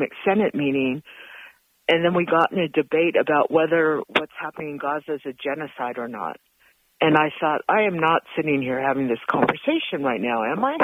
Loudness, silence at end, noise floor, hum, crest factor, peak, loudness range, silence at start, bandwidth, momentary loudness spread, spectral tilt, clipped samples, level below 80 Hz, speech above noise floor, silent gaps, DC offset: -22 LUFS; 0 s; -61 dBFS; none; 18 dB; -4 dBFS; 5 LU; 0 s; 15.5 kHz; 11 LU; -7.5 dB/octave; under 0.1%; -66 dBFS; 39 dB; none; under 0.1%